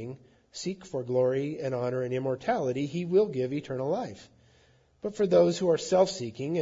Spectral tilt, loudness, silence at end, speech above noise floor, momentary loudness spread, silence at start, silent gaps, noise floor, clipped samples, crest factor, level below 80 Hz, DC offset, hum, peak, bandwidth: -6 dB/octave; -28 LUFS; 0 s; 35 dB; 14 LU; 0 s; none; -63 dBFS; under 0.1%; 18 dB; -68 dBFS; under 0.1%; none; -10 dBFS; 7.8 kHz